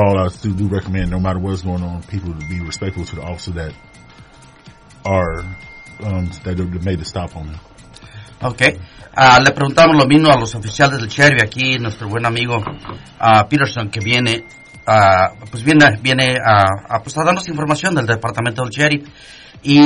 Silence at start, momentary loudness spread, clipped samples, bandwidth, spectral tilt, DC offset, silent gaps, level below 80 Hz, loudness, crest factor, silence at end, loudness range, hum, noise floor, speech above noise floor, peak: 0 s; 17 LU; under 0.1%; 11 kHz; -5 dB/octave; under 0.1%; none; -40 dBFS; -15 LUFS; 16 dB; 0 s; 13 LU; none; -42 dBFS; 27 dB; 0 dBFS